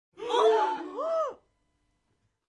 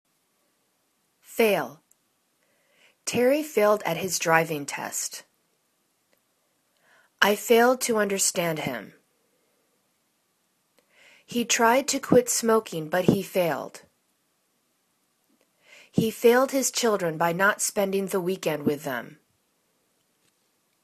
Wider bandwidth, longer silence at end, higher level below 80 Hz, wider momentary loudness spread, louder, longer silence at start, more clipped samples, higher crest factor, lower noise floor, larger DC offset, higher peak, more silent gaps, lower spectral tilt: second, 10.5 kHz vs 14 kHz; second, 1.15 s vs 1.7 s; second, -76 dBFS vs -68 dBFS; second, 9 LU vs 13 LU; second, -28 LUFS vs -24 LUFS; second, 0.2 s vs 1.3 s; neither; second, 18 dB vs 24 dB; first, -75 dBFS vs -71 dBFS; neither; second, -12 dBFS vs -4 dBFS; neither; about the same, -2.5 dB/octave vs -3.5 dB/octave